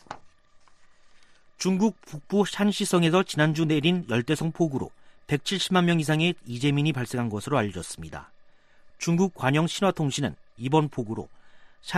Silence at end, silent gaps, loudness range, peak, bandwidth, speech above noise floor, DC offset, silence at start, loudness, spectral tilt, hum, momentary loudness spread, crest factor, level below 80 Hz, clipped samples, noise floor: 0 s; none; 3 LU; -6 dBFS; 13.5 kHz; 30 dB; under 0.1%; 0.1 s; -25 LUFS; -5.5 dB/octave; none; 14 LU; 20 dB; -58 dBFS; under 0.1%; -54 dBFS